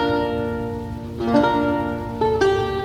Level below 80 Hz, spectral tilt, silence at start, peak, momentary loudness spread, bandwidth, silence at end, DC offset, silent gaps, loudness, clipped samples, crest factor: -40 dBFS; -7 dB/octave; 0 s; -4 dBFS; 10 LU; 15.5 kHz; 0 s; under 0.1%; none; -21 LUFS; under 0.1%; 18 dB